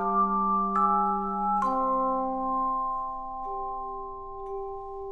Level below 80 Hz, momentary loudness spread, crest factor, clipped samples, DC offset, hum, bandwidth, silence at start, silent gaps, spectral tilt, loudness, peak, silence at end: -48 dBFS; 13 LU; 16 dB; under 0.1%; under 0.1%; none; 8.4 kHz; 0 s; none; -9 dB/octave; -28 LUFS; -14 dBFS; 0 s